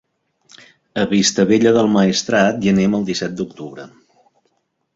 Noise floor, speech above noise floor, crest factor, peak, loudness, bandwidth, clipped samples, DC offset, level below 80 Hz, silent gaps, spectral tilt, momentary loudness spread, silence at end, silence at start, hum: -67 dBFS; 51 dB; 16 dB; -2 dBFS; -16 LUFS; 8 kHz; under 0.1%; under 0.1%; -54 dBFS; none; -4.5 dB/octave; 15 LU; 1.1 s; 0.95 s; none